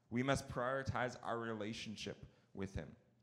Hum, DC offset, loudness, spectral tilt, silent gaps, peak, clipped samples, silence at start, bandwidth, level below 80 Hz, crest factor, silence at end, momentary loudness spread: none; under 0.1%; -42 LUFS; -5.5 dB/octave; none; -22 dBFS; under 0.1%; 0.1 s; 15 kHz; -62 dBFS; 22 dB; 0.3 s; 13 LU